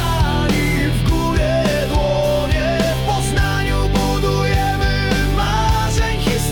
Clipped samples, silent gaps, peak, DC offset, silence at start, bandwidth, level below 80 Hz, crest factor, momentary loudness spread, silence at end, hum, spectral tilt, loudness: under 0.1%; none; -6 dBFS; under 0.1%; 0 s; 18 kHz; -22 dBFS; 10 dB; 1 LU; 0 s; none; -5.5 dB/octave; -17 LUFS